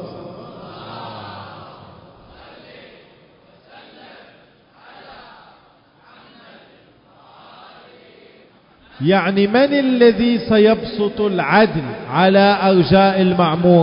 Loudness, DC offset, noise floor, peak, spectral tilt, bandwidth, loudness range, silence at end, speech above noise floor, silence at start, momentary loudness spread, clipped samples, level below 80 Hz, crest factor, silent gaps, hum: -15 LUFS; under 0.1%; -51 dBFS; 0 dBFS; -11.5 dB/octave; 5.4 kHz; 22 LU; 0 s; 38 dB; 0 s; 22 LU; under 0.1%; -50 dBFS; 18 dB; none; none